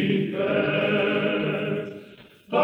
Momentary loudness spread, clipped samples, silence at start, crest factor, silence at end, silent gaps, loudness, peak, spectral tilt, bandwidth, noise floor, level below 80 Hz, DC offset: 9 LU; under 0.1%; 0 s; 16 dB; 0 s; none; -24 LUFS; -8 dBFS; -8 dB/octave; 5.6 kHz; -48 dBFS; -66 dBFS; under 0.1%